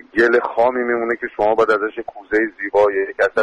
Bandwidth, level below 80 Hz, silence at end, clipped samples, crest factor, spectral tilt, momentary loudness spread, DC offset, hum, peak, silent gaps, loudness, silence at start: 9.4 kHz; -52 dBFS; 0 s; under 0.1%; 14 dB; -5.5 dB/octave; 6 LU; under 0.1%; none; -4 dBFS; none; -18 LUFS; 0.15 s